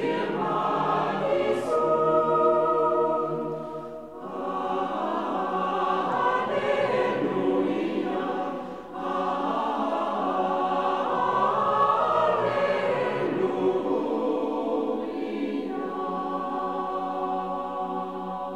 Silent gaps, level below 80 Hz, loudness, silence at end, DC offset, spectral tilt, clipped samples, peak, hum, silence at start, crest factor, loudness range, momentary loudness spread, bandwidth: none; -64 dBFS; -26 LUFS; 0 s; 0.2%; -6.5 dB/octave; under 0.1%; -10 dBFS; none; 0 s; 16 dB; 5 LU; 9 LU; 11.5 kHz